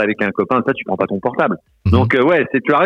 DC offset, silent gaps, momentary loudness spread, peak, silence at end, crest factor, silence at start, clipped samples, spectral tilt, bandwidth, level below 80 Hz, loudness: under 0.1%; none; 7 LU; 0 dBFS; 0 s; 16 dB; 0 s; under 0.1%; -8.5 dB/octave; 6.4 kHz; -38 dBFS; -16 LUFS